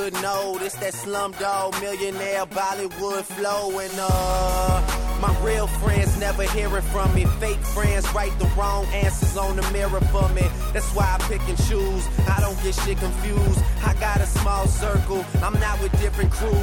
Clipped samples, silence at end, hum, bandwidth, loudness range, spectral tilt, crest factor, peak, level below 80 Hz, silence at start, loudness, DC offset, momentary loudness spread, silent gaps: under 0.1%; 0 s; none; 17.5 kHz; 3 LU; -5 dB/octave; 14 dB; -6 dBFS; -24 dBFS; 0 s; -23 LUFS; under 0.1%; 5 LU; none